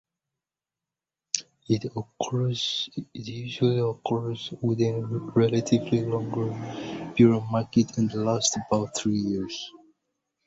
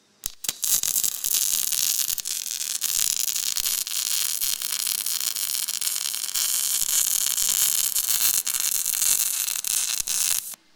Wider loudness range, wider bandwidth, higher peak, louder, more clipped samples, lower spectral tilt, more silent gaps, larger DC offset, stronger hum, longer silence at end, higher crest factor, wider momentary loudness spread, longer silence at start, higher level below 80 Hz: about the same, 4 LU vs 3 LU; second, 8 kHz vs 19 kHz; second, -4 dBFS vs 0 dBFS; second, -26 LUFS vs -22 LUFS; neither; first, -5.5 dB/octave vs 3.5 dB/octave; neither; neither; neither; first, 0.75 s vs 0.2 s; about the same, 24 dB vs 26 dB; first, 12 LU vs 5 LU; first, 1.35 s vs 0.25 s; about the same, -60 dBFS vs -60 dBFS